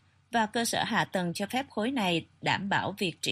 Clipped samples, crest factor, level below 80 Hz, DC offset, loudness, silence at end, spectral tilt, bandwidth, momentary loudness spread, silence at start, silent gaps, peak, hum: under 0.1%; 18 dB; -70 dBFS; under 0.1%; -30 LUFS; 0 s; -4 dB/octave; 15.5 kHz; 4 LU; 0.3 s; none; -12 dBFS; none